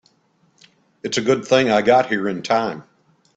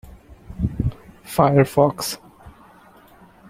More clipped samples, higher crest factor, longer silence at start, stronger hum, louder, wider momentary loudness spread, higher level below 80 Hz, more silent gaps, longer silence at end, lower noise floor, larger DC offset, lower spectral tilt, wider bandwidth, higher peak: neither; about the same, 20 dB vs 20 dB; first, 1.05 s vs 0.05 s; neither; about the same, -18 LUFS vs -20 LUFS; about the same, 12 LU vs 13 LU; second, -60 dBFS vs -40 dBFS; neither; second, 0.55 s vs 1 s; first, -61 dBFS vs -49 dBFS; neither; second, -4.5 dB/octave vs -6 dB/octave; second, 8.8 kHz vs 16.5 kHz; about the same, 0 dBFS vs -2 dBFS